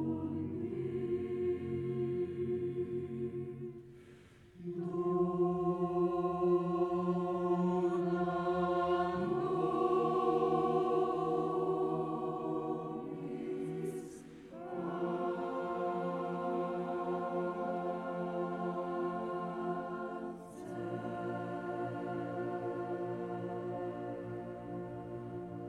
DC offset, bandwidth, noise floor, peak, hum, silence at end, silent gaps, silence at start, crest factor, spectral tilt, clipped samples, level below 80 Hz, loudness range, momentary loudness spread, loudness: under 0.1%; 10 kHz; -58 dBFS; -20 dBFS; none; 0 s; none; 0 s; 16 dB; -8.5 dB/octave; under 0.1%; -68 dBFS; 7 LU; 12 LU; -36 LUFS